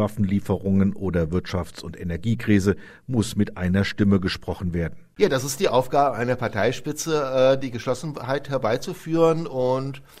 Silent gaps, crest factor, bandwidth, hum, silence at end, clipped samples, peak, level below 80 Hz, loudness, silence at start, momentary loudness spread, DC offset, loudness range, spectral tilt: none; 18 dB; 16 kHz; none; 0.15 s; under 0.1%; -4 dBFS; -48 dBFS; -23 LUFS; 0 s; 8 LU; under 0.1%; 2 LU; -6 dB/octave